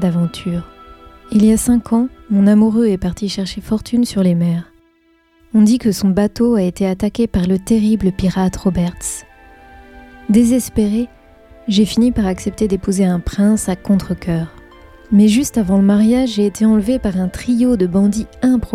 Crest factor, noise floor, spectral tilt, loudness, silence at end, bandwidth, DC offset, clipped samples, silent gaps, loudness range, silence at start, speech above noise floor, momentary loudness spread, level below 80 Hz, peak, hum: 12 dB; -55 dBFS; -6.5 dB/octave; -15 LUFS; 0 s; 15 kHz; under 0.1%; under 0.1%; none; 3 LU; 0 s; 41 dB; 9 LU; -36 dBFS; -2 dBFS; none